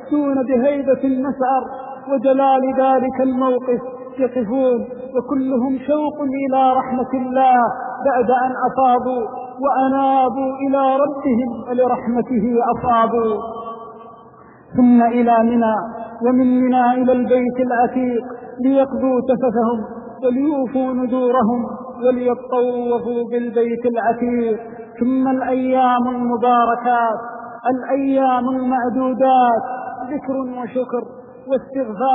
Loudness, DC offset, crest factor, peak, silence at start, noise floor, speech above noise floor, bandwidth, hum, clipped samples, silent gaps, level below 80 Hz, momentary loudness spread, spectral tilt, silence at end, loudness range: -18 LUFS; under 0.1%; 12 dB; -4 dBFS; 0 s; -43 dBFS; 27 dB; 3.9 kHz; none; under 0.1%; none; -54 dBFS; 10 LU; -5.5 dB/octave; 0 s; 3 LU